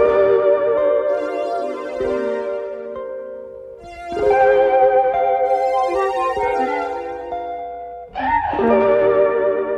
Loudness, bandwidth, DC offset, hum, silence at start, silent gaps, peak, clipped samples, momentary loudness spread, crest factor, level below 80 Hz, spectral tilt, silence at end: -18 LUFS; 9.6 kHz; under 0.1%; none; 0 s; none; -2 dBFS; under 0.1%; 16 LU; 16 dB; -48 dBFS; -6 dB/octave; 0 s